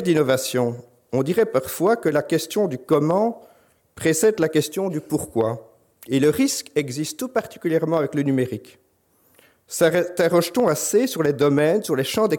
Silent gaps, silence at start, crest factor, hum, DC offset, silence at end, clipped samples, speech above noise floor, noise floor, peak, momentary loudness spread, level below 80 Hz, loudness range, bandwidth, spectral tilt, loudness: none; 0 s; 16 dB; none; under 0.1%; 0 s; under 0.1%; 42 dB; -62 dBFS; -6 dBFS; 8 LU; -60 dBFS; 3 LU; 17.5 kHz; -5 dB/octave; -21 LUFS